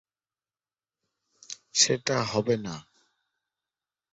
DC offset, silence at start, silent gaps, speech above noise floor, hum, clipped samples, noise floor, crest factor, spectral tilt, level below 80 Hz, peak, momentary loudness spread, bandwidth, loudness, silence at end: under 0.1%; 1.5 s; none; over 64 dB; none; under 0.1%; under -90 dBFS; 26 dB; -2.5 dB/octave; -66 dBFS; -6 dBFS; 20 LU; 8.4 kHz; -25 LUFS; 1.3 s